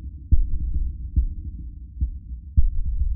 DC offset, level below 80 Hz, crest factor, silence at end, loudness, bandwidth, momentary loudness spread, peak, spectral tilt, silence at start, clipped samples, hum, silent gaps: under 0.1%; -24 dBFS; 18 dB; 0 s; -28 LUFS; 0.4 kHz; 12 LU; -4 dBFS; -18 dB/octave; 0 s; under 0.1%; none; none